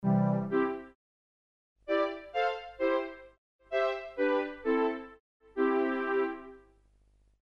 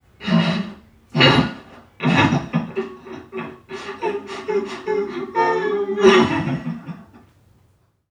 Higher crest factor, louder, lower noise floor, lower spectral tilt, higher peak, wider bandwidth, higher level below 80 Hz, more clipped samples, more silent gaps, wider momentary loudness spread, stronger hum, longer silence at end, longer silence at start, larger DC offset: about the same, 16 dB vs 20 dB; second, -31 LUFS vs -19 LUFS; first, -66 dBFS vs -60 dBFS; first, -8.5 dB/octave vs -6 dB/octave; second, -18 dBFS vs 0 dBFS; second, 6.8 kHz vs 10.5 kHz; second, -66 dBFS vs -50 dBFS; neither; first, 0.95-1.76 s, 3.38-3.59 s, 5.20-5.40 s vs none; second, 14 LU vs 19 LU; first, 50 Hz at -70 dBFS vs none; about the same, 0.85 s vs 0.95 s; second, 0 s vs 0.2 s; neither